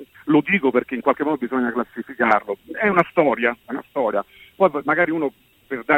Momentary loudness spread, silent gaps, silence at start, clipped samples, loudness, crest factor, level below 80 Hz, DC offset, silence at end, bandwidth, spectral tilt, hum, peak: 12 LU; none; 0 s; under 0.1%; -21 LUFS; 20 dB; -60 dBFS; under 0.1%; 0 s; 16 kHz; -8 dB/octave; none; -2 dBFS